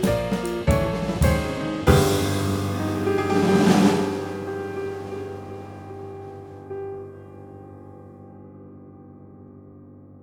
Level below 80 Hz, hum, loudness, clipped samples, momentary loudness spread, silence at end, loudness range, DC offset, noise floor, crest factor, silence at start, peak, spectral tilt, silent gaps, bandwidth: -36 dBFS; none; -23 LUFS; under 0.1%; 25 LU; 0.05 s; 19 LU; under 0.1%; -45 dBFS; 22 dB; 0 s; -4 dBFS; -6 dB/octave; none; 19.5 kHz